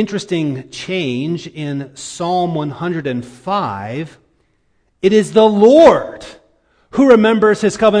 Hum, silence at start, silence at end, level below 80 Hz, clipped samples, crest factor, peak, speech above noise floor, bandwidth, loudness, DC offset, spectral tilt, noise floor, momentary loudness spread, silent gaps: none; 0 s; 0 s; -50 dBFS; 0.1%; 14 dB; 0 dBFS; 47 dB; 10.5 kHz; -14 LUFS; under 0.1%; -6 dB/octave; -60 dBFS; 16 LU; none